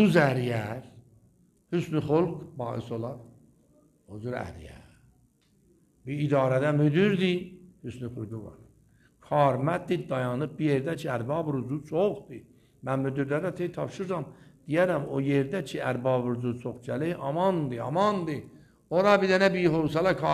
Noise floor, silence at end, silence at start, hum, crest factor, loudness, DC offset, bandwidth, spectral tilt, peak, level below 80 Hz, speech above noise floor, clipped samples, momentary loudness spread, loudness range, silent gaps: -65 dBFS; 0 s; 0 s; none; 22 dB; -28 LUFS; under 0.1%; 14 kHz; -7.5 dB/octave; -6 dBFS; -60 dBFS; 38 dB; under 0.1%; 17 LU; 6 LU; none